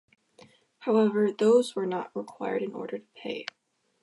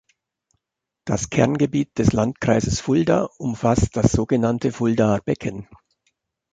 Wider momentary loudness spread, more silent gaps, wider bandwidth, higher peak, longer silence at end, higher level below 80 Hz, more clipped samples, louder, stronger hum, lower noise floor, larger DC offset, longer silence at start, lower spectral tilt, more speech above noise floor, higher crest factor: first, 15 LU vs 8 LU; neither; first, 11.5 kHz vs 9.4 kHz; second, -12 dBFS vs -2 dBFS; second, 0.6 s vs 0.9 s; second, -84 dBFS vs -40 dBFS; neither; second, -28 LUFS vs -21 LUFS; neither; second, -58 dBFS vs -83 dBFS; neither; second, 0.8 s vs 1.05 s; about the same, -6 dB/octave vs -6.5 dB/octave; second, 31 dB vs 63 dB; about the same, 18 dB vs 18 dB